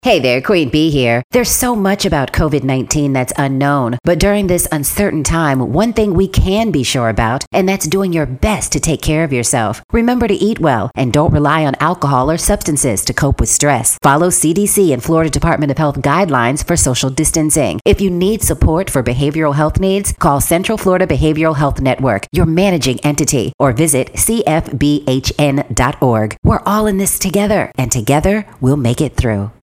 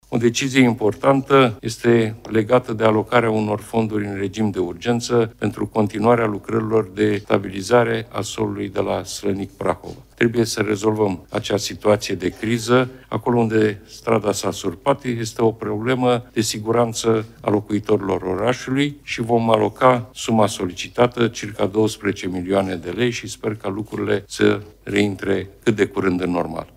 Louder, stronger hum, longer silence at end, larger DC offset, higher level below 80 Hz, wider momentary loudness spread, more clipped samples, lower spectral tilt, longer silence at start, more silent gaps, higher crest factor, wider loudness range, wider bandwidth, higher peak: first, -13 LUFS vs -20 LUFS; neither; about the same, 0.1 s vs 0.1 s; first, 0.1% vs under 0.1%; first, -26 dBFS vs -50 dBFS; second, 4 LU vs 8 LU; neither; about the same, -4.5 dB/octave vs -5.5 dB/octave; about the same, 0.05 s vs 0.1 s; first, 1.24-1.30 s, 7.47-7.51 s, 9.84-9.89 s, 17.81-17.85 s, 23.54-23.59 s, 26.38-26.43 s vs none; second, 14 dB vs 20 dB; about the same, 2 LU vs 4 LU; about the same, 16.5 kHz vs 16 kHz; about the same, 0 dBFS vs 0 dBFS